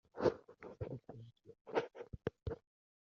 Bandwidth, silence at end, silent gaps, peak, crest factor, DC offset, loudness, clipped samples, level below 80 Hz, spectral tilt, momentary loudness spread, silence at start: 7 kHz; 0.45 s; 1.61-1.65 s; -18 dBFS; 26 dB; under 0.1%; -43 LUFS; under 0.1%; -62 dBFS; -6 dB/octave; 19 LU; 0.15 s